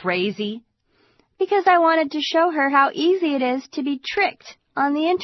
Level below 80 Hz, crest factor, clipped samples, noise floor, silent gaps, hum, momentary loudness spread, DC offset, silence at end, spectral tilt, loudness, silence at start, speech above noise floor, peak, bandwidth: -68 dBFS; 18 dB; under 0.1%; -63 dBFS; none; none; 11 LU; under 0.1%; 0 s; -5 dB/octave; -20 LUFS; 0 s; 43 dB; -4 dBFS; 6.2 kHz